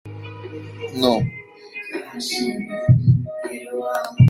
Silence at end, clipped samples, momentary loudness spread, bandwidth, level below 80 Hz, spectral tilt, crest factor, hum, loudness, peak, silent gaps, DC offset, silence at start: 0 s; under 0.1%; 18 LU; 15 kHz; -48 dBFS; -6.5 dB/octave; 18 dB; none; -22 LUFS; -2 dBFS; none; under 0.1%; 0.05 s